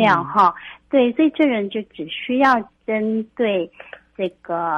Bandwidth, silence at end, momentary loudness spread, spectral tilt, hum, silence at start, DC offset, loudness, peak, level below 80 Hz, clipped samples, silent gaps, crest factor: 7 kHz; 0 s; 12 LU; -7 dB/octave; none; 0 s; under 0.1%; -20 LUFS; -4 dBFS; -62 dBFS; under 0.1%; none; 16 dB